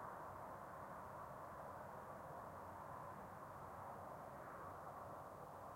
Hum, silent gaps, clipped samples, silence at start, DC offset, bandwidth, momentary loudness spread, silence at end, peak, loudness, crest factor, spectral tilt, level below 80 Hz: none; none; under 0.1%; 0 s; under 0.1%; 16.5 kHz; 1 LU; 0 s; -40 dBFS; -54 LUFS; 14 dB; -6 dB/octave; -74 dBFS